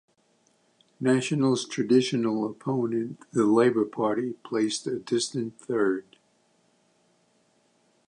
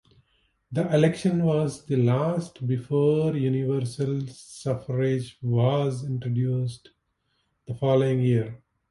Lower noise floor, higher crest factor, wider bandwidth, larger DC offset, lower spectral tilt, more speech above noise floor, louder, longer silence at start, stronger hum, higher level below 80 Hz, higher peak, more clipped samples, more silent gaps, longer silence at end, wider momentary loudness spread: second, -67 dBFS vs -73 dBFS; about the same, 18 dB vs 18 dB; about the same, 11 kHz vs 11.5 kHz; neither; second, -5.5 dB/octave vs -8 dB/octave; second, 41 dB vs 49 dB; about the same, -26 LUFS vs -25 LUFS; first, 1 s vs 0.7 s; neither; second, -74 dBFS vs -60 dBFS; about the same, -8 dBFS vs -8 dBFS; neither; neither; first, 2.05 s vs 0.35 s; about the same, 9 LU vs 10 LU